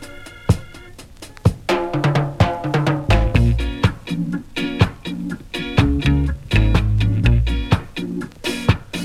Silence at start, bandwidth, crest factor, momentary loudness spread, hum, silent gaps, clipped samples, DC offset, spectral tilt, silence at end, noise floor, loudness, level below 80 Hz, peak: 0 s; 13.5 kHz; 18 dB; 11 LU; none; none; under 0.1%; under 0.1%; -6.5 dB/octave; 0 s; -39 dBFS; -20 LUFS; -24 dBFS; 0 dBFS